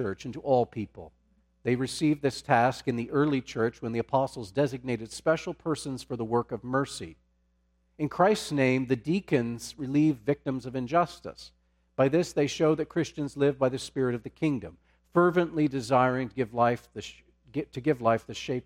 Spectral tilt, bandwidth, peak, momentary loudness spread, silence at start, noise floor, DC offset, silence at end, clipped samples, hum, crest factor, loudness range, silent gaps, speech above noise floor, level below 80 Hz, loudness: -6 dB/octave; 15.5 kHz; -8 dBFS; 11 LU; 0 s; -70 dBFS; under 0.1%; 0.05 s; under 0.1%; none; 20 dB; 3 LU; none; 42 dB; -60 dBFS; -28 LUFS